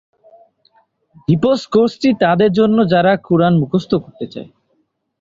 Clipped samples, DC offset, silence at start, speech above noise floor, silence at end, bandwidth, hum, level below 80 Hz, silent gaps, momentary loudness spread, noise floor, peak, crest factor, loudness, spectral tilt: under 0.1%; under 0.1%; 1.3 s; 51 dB; 0.75 s; 7.6 kHz; none; -52 dBFS; none; 15 LU; -65 dBFS; -2 dBFS; 14 dB; -14 LUFS; -8 dB/octave